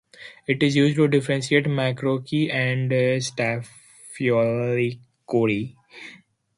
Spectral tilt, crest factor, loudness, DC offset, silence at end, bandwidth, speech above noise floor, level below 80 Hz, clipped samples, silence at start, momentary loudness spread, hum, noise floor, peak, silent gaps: -6 dB/octave; 18 dB; -22 LUFS; under 0.1%; 0.4 s; 11.5 kHz; 28 dB; -62 dBFS; under 0.1%; 0.2 s; 22 LU; none; -50 dBFS; -6 dBFS; none